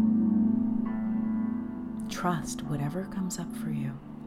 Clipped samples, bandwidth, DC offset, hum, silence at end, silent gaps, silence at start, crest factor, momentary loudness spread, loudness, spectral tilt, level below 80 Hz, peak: under 0.1%; 14.5 kHz; under 0.1%; none; 0 s; none; 0 s; 14 dB; 10 LU; -30 LUFS; -6.5 dB/octave; -54 dBFS; -16 dBFS